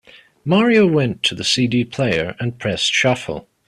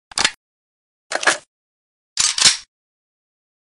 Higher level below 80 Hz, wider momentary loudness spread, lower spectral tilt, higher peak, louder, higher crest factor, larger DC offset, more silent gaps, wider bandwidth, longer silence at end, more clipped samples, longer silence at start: first, -52 dBFS vs -58 dBFS; second, 10 LU vs 14 LU; first, -4.5 dB/octave vs 1.5 dB/octave; about the same, -2 dBFS vs 0 dBFS; about the same, -17 LUFS vs -17 LUFS; second, 16 dB vs 22 dB; neither; second, none vs 0.37-1.10 s, 1.47-2.16 s; about the same, 13 kHz vs 12 kHz; second, 0.25 s vs 1 s; neither; first, 0.45 s vs 0.15 s